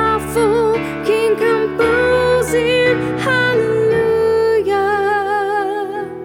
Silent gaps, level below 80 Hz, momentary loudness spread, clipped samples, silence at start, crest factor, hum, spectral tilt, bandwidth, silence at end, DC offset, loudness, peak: none; -40 dBFS; 4 LU; under 0.1%; 0 s; 12 dB; none; -5 dB/octave; 16.5 kHz; 0 s; under 0.1%; -15 LUFS; -4 dBFS